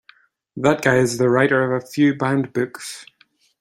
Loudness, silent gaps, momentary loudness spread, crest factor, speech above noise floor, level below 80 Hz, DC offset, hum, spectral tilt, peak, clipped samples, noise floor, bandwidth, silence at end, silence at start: -19 LUFS; none; 16 LU; 18 dB; 35 dB; -58 dBFS; under 0.1%; none; -6 dB/octave; -2 dBFS; under 0.1%; -54 dBFS; 15.5 kHz; 0.55 s; 0.55 s